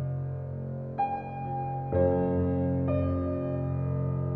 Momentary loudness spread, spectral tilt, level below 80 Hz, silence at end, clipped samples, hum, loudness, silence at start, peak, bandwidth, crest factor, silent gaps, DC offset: 9 LU; -12.5 dB/octave; -50 dBFS; 0 s; under 0.1%; none; -30 LUFS; 0 s; -14 dBFS; 3.9 kHz; 16 dB; none; under 0.1%